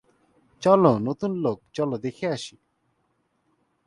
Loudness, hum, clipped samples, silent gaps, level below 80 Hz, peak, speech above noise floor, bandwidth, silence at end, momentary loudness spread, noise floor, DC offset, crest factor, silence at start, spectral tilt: -24 LUFS; none; under 0.1%; none; -64 dBFS; -4 dBFS; 48 dB; 11 kHz; 1.4 s; 11 LU; -71 dBFS; under 0.1%; 22 dB; 0.6 s; -7 dB/octave